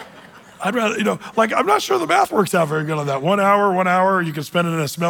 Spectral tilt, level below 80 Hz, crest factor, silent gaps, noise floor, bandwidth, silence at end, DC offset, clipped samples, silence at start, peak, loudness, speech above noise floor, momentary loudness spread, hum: -5 dB/octave; -64 dBFS; 16 dB; none; -43 dBFS; 19.5 kHz; 0 s; under 0.1%; under 0.1%; 0 s; -4 dBFS; -18 LUFS; 25 dB; 6 LU; none